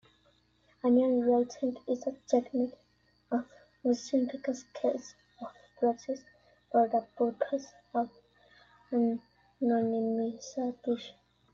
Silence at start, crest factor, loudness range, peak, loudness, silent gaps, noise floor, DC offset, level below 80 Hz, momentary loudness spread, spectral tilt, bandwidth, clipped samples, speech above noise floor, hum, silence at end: 0.85 s; 20 dB; 3 LU; -12 dBFS; -32 LUFS; none; -68 dBFS; under 0.1%; -74 dBFS; 13 LU; -5.5 dB/octave; 7.4 kHz; under 0.1%; 38 dB; 60 Hz at -55 dBFS; 0.4 s